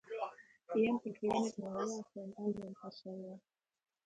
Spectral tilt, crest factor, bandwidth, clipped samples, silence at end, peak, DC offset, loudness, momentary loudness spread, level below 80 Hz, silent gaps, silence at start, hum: -5.5 dB/octave; 18 dB; 9.2 kHz; under 0.1%; 0.65 s; -22 dBFS; under 0.1%; -39 LUFS; 14 LU; -76 dBFS; none; 0.05 s; none